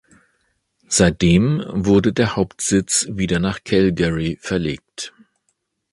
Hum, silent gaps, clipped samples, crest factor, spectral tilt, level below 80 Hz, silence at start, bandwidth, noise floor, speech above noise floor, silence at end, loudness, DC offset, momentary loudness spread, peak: none; none; under 0.1%; 18 dB; -5 dB/octave; -40 dBFS; 0.9 s; 11.5 kHz; -71 dBFS; 53 dB; 0.85 s; -18 LUFS; under 0.1%; 10 LU; 0 dBFS